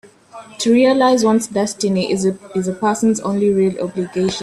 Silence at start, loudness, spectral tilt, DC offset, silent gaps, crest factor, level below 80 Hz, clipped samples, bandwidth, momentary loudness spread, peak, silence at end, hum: 0.35 s; -17 LUFS; -5 dB/octave; under 0.1%; none; 14 dB; -56 dBFS; under 0.1%; 13 kHz; 9 LU; -4 dBFS; 0 s; none